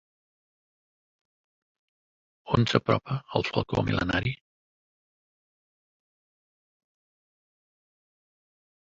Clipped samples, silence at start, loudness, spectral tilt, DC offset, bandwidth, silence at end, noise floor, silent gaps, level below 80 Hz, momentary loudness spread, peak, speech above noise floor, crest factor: under 0.1%; 2.45 s; -27 LUFS; -6.5 dB/octave; under 0.1%; 7.8 kHz; 4.45 s; under -90 dBFS; none; -52 dBFS; 6 LU; -6 dBFS; over 64 dB; 28 dB